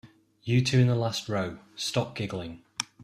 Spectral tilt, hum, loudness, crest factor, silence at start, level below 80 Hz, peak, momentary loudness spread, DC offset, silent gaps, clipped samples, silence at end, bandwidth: -5.5 dB/octave; none; -28 LUFS; 20 dB; 0.05 s; -60 dBFS; -10 dBFS; 13 LU; under 0.1%; none; under 0.1%; 0 s; 13.5 kHz